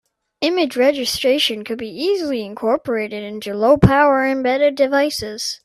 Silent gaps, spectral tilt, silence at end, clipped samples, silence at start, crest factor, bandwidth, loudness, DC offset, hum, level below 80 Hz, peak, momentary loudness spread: none; -5 dB/octave; 0.1 s; under 0.1%; 0.4 s; 18 dB; 14.5 kHz; -18 LUFS; under 0.1%; none; -42 dBFS; 0 dBFS; 11 LU